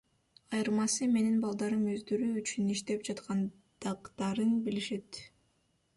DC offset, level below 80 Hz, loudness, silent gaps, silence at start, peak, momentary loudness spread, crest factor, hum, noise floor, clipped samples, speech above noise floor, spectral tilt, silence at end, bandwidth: under 0.1%; -72 dBFS; -33 LUFS; none; 0.5 s; -20 dBFS; 11 LU; 12 dB; none; -74 dBFS; under 0.1%; 42 dB; -4.5 dB/octave; 0.7 s; 11.5 kHz